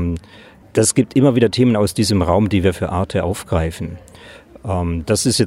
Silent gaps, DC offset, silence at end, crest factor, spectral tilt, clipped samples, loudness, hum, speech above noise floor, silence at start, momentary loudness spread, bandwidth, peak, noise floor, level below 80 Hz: none; under 0.1%; 0 s; 16 dB; -5.5 dB/octave; under 0.1%; -17 LUFS; none; 27 dB; 0 s; 12 LU; 16 kHz; -2 dBFS; -43 dBFS; -40 dBFS